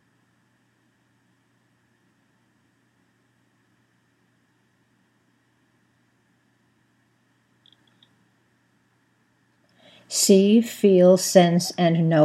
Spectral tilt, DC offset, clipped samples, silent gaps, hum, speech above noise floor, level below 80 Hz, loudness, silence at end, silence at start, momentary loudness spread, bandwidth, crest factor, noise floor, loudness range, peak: -5 dB/octave; under 0.1%; under 0.1%; none; none; 49 dB; -82 dBFS; -18 LUFS; 0 s; 10.1 s; 6 LU; 15 kHz; 24 dB; -66 dBFS; 7 LU; -2 dBFS